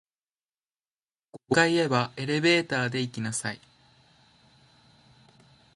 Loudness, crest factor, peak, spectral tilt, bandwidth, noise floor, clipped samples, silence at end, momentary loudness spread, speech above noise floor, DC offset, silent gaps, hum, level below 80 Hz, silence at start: -26 LUFS; 24 dB; -6 dBFS; -4.5 dB/octave; 11.5 kHz; under -90 dBFS; under 0.1%; 2.2 s; 9 LU; over 64 dB; under 0.1%; none; none; -68 dBFS; 1.35 s